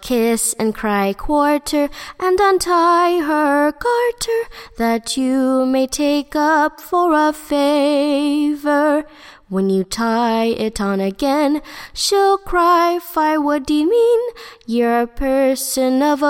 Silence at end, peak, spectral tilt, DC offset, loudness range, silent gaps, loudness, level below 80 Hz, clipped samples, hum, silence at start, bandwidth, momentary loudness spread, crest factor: 0 s; -2 dBFS; -4 dB/octave; under 0.1%; 2 LU; none; -17 LUFS; -40 dBFS; under 0.1%; none; 0 s; 16.5 kHz; 6 LU; 14 dB